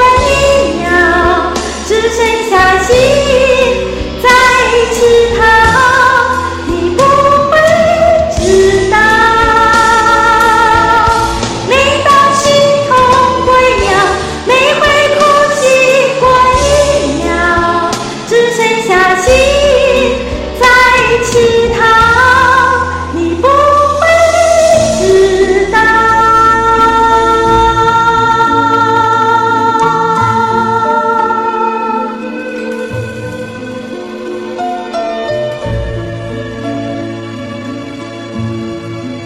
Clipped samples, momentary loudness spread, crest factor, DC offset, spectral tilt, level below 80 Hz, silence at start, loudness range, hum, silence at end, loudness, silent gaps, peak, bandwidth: 0.1%; 13 LU; 8 dB; under 0.1%; -4 dB/octave; -28 dBFS; 0 s; 11 LU; none; 0 s; -8 LUFS; none; 0 dBFS; 16.5 kHz